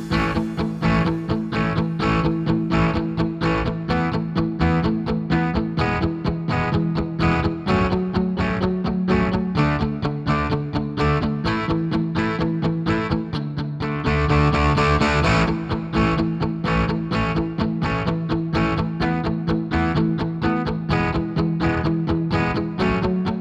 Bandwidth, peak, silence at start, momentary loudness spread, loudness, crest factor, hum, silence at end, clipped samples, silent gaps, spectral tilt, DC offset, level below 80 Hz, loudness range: 8.2 kHz; -6 dBFS; 0 s; 5 LU; -21 LUFS; 14 dB; none; 0 s; under 0.1%; none; -7.5 dB/octave; under 0.1%; -34 dBFS; 2 LU